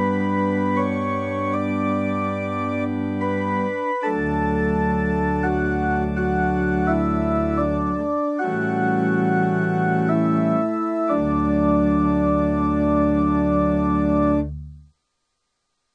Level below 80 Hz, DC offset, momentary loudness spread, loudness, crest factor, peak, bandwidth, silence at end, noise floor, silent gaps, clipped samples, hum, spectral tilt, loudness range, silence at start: -36 dBFS; under 0.1%; 5 LU; -21 LUFS; 14 dB; -6 dBFS; 8.4 kHz; 1.15 s; -74 dBFS; none; under 0.1%; none; -9 dB/octave; 3 LU; 0 s